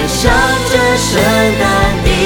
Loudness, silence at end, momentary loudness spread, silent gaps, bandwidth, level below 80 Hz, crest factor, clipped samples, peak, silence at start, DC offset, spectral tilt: -11 LUFS; 0 s; 1 LU; none; over 20 kHz; -22 dBFS; 10 dB; under 0.1%; 0 dBFS; 0 s; under 0.1%; -4 dB/octave